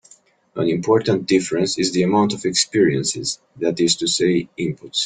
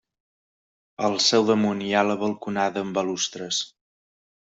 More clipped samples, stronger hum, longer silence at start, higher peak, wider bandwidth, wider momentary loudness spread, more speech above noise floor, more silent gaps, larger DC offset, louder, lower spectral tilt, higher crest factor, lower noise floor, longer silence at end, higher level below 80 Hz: neither; neither; second, 0.55 s vs 1 s; first, -2 dBFS vs -6 dBFS; first, 10 kHz vs 8.2 kHz; about the same, 8 LU vs 8 LU; second, 33 dB vs over 67 dB; neither; neither; first, -19 LUFS vs -23 LUFS; about the same, -4 dB/octave vs -3.5 dB/octave; about the same, 18 dB vs 20 dB; second, -52 dBFS vs under -90 dBFS; second, 0 s vs 0.85 s; first, -58 dBFS vs -70 dBFS